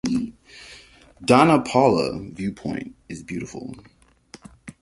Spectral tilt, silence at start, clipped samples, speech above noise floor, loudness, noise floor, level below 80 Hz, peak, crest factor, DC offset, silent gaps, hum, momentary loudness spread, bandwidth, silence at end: -6 dB/octave; 0.05 s; under 0.1%; 28 dB; -21 LUFS; -49 dBFS; -52 dBFS; -2 dBFS; 22 dB; under 0.1%; none; none; 26 LU; 11.5 kHz; 0.1 s